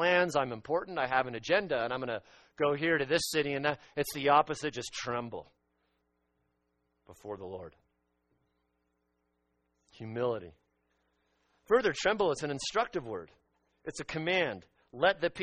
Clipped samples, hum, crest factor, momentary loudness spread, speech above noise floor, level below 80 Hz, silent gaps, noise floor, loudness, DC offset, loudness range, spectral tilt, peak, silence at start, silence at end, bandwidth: under 0.1%; none; 22 dB; 16 LU; 47 dB; -66 dBFS; none; -79 dBFS; -31 LUFS; under 0.1%; 20 LU; -4 dB/octave; -12 dBFS; 0 s; 0 s; 9.4 kHz